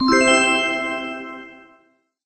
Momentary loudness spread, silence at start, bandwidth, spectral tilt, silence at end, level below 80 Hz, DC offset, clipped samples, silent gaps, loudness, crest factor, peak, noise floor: 20 LU; 0 s; 8.6 kHz; -2 dB/octave; 0.7 s; -52 dBFS; under 0.1%; under 0.1%; none; -17 LUFS; 18 dB; -4 dBFS; -60 dBFS